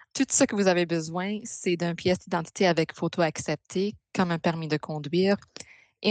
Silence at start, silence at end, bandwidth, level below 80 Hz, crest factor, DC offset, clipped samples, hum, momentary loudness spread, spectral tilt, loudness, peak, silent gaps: 0.15 s; 0 s; 9.4 kHz; -66 dBFS; 18 dB; under 0.1%; under 0.1%; none; 8 LU; -4.5 dB/octave; -27 LUFS; -10 dBFS; none